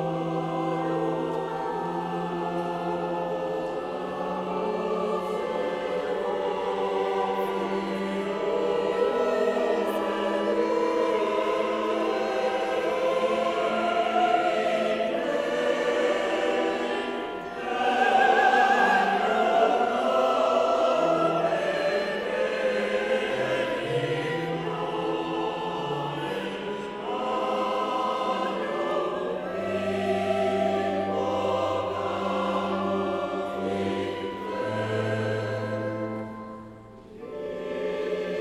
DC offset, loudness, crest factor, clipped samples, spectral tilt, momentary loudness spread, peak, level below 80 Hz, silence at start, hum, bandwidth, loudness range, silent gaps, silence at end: under 0.1%; -26 LUFS; 18 dB; under 0.1%; -5.5 dB/octave; 8 LU; -8 dBFS; -62 dBFS; 0 s; none; 14.5 kHz; 7 LU; none; 0 s